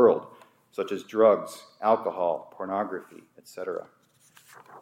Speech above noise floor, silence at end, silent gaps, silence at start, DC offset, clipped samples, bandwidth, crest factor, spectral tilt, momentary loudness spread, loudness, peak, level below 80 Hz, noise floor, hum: 32 dB; 0 s; none; 0 s; under 0.1%; under 0.1%; 15.5 kHz; 20 dB; -6 dB/octave; 17 LU; -27 LUFS; -6 dBFS; -84 dBFS; -59 dBFS; none